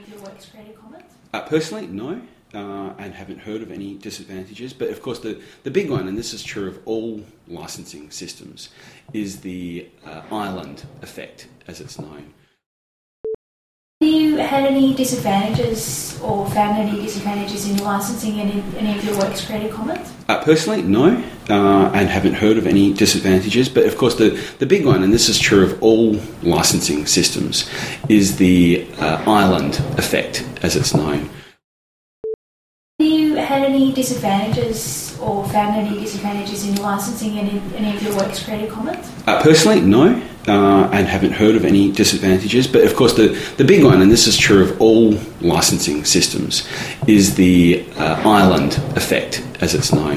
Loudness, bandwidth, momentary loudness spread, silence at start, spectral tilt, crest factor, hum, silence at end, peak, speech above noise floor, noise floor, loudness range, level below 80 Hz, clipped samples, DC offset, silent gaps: -16 LUFS; 16 kHz; 20 LU; 0.1 s; -4.5 dB/octave; 16 dB; none; 0 s; 0 dBFS; over 74 dB; under -90 dBFS; 19 LU; -40 dBFS; under 0.1%; under 0.1%; 12.66-13.24 s, 13.35-14.01 s, 31.64-32.24 s, 32.34-32.99 s